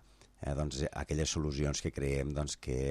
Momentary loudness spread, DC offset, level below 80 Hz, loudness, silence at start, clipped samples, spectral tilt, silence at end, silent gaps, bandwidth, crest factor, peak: 4 LU; under 0.1%; -44 dBFS; -36 LUFS; 0.4 s; under 0.1%; -5 dB/octave; 0 s; none; 13 kHz; 14 dB; -22 dBFS